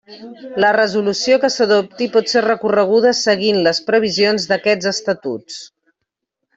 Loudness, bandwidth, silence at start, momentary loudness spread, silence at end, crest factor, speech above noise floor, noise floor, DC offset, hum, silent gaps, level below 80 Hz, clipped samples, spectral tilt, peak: -15 LUFS; 8 kHz; 0.1 s; 11 LU; 0.9 s; 14 dB; 62 dB; -78 dBFS; under 0.1%; none; none; -62 dBFS; under 0.1%; -3.5 dB/octave; -2 dBFS